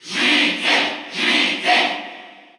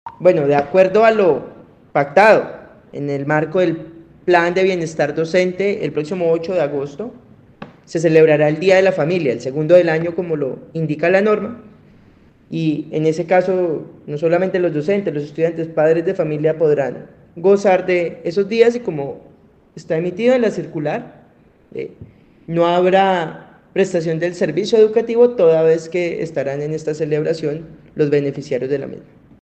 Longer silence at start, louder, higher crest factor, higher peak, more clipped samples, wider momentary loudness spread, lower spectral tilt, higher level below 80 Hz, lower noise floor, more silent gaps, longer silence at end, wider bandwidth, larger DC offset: about the same, 0.05 s vs 0.05 s; about the same, -16 LUFS vs -17 LUFS; about the same, 16 dB vs 16 dB; second, -4 dBFS vs 0 dBFS; neither; second, 8 LU vs 14 LU; second, -1.5 dB/octave vs -6.5 dB/octave; second, -84 dBFS vs -58 dBFS; second, -39 dBFS vs -50 dBFS; neither; second, 0.25 s vs 0.4 s; first, over 20 kHz vs 8.6 kHz; neither